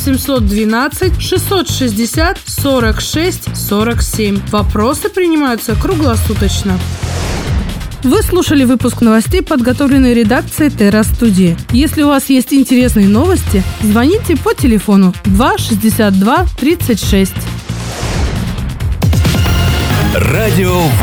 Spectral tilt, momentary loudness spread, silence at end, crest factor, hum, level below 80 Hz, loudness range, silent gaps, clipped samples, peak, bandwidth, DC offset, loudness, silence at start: -5.5 dB/octave; 7 LU; 0 s; 10 dB; none; -22 dBFS; 4 LU; none; under 0.1%; 0 dBFS; over 20 kHz; under 0.1%; -12 LUFS; 0 s